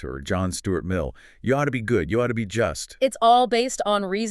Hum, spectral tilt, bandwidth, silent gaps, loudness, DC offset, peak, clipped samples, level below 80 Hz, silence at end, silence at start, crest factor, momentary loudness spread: none; -5 dB/octave; 13 kHz; none; -23 LUFS; under 0.1%; -6 dBFS; under 0.1%; -44 dBFS; 0 s; 0 s; 18 dB; 10 LU